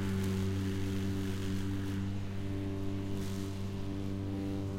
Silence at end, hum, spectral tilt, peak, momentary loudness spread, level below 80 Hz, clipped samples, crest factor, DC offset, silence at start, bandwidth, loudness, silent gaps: 0 s; none; -7 dB/octave; -22 dBFS; 5 LU; -48 dBFS; under 0.1%; 12 dB; under 0.1%; 0 s; 16.5 kHz; -37 LUFS; none